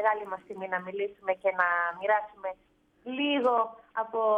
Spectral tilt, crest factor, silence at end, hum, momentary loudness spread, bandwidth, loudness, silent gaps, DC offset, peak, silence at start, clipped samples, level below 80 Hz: -6 dB/octave; 18 dB; 0 s; none; 13 LU; 5.6 kHz; -30 LUFS; none; under 0.1%; -10 dBFS; 0 s; under 0.1%; -74 dBFS